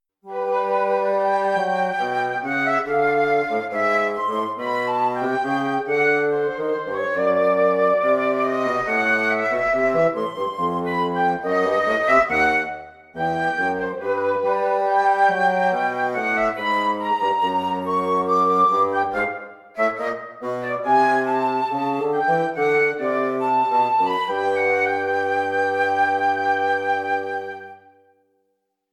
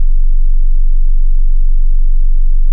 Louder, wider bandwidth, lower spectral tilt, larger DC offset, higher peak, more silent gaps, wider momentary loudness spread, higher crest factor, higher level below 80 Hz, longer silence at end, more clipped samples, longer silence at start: second, -21 LUFS vs -18 LUFS; first, 13 kHz vs 0 kHz; second, -5.5 dB/octave vs -15.5 dB/octave; neither; about the same, -4 dBFS vs -2 dBFS; neither; first, 7 LU vs 0 LU; first, 18 dB vs 4 dB; second, -58 dBFS vs -6 dBFS; first, 1.15 s vs 0 s; neither; first, 0.25 s vs 0 s